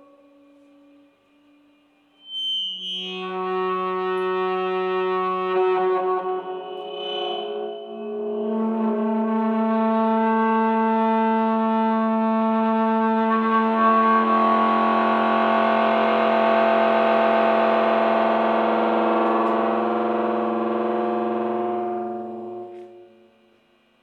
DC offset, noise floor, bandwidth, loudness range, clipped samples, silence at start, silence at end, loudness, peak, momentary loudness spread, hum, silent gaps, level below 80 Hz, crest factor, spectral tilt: under 0.1%; -60 dBFS; 6.6 kHz; 8 LU; under 0.1%; 2.25 s; 1 s; -21 LUFS; -6 dBFS; 10 LU; none; none; -82 dBFS; 14 dB; -7 dB/octave